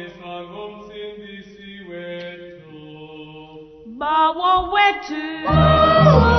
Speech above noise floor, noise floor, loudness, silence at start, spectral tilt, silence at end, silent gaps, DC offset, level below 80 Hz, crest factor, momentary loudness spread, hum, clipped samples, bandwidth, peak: 23 dB; -40 dBFS; -16 LUFS; 0 s; -7.5 dB/octave; 0 s; none; under 0.1%; -32 dBFS; 18 dB; 26 LU; none; under 0.1%; 6.4 kHz; 0 dBFS